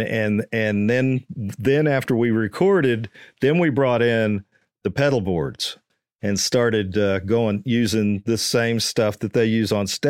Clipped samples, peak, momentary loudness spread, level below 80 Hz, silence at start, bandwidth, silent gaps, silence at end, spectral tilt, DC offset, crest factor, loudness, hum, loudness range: under 0.1%; -6 dBFS; 8 LU; -54 dBFS; 0 s; 16.5 kHz; none; 0 s; -5.5 dB/octave; under 0.1%; 16 dB; -21 LUFS; none; 2 LU